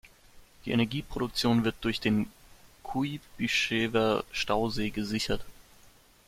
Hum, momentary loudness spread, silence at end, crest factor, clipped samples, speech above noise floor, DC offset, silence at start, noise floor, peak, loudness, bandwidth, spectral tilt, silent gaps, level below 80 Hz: none; 9 LU; 0.75 s; 18 dB; under 0.1%; 29 dB; under 0.1%; 0.05 s; -58 dBFS; -12 dBFS; -29 LUFS; 16 kHz; -5 dB/octave; none; -50 dBFS